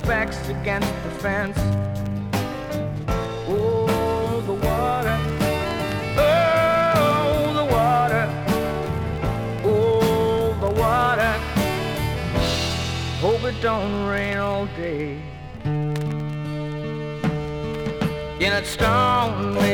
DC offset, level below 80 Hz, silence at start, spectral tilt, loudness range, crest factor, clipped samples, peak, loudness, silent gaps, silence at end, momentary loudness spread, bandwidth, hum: under 0.1%; -36 dBFS; 0 s; -6 dB/octave; 6 LU; 16 dB; under 0.1%; -6 dBFS; -22 LUFS; none; 0 s; 9 LU; 19 kHz; none